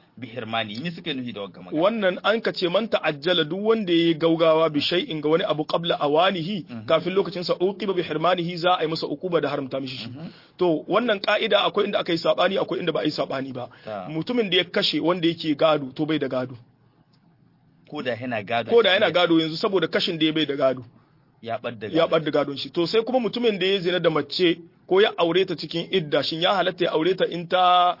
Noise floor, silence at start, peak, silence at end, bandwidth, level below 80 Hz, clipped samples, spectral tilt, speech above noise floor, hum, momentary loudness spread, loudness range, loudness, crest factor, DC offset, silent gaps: -59 dBFS; 0.15 s; -6 dBFS; 0.05 s; 5.8 kHz; -68 dBFS; under 0.1%; -6.5 dB/octave; 36 dB; none; 11 LU; 3 LU; -23 LUFS; 16 dB; under 0.1%; none